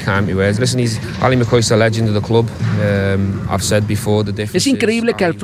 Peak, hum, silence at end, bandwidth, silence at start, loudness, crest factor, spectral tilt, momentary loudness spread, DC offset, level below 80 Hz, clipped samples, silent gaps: 0 dBFS; none; 0 s; 15.5 kHz; 0 s; -15 LUFS; 14 dB; -5.5 dB/octave; 5 LU; under 0.1%; -42 dBFS; under 0.1%; none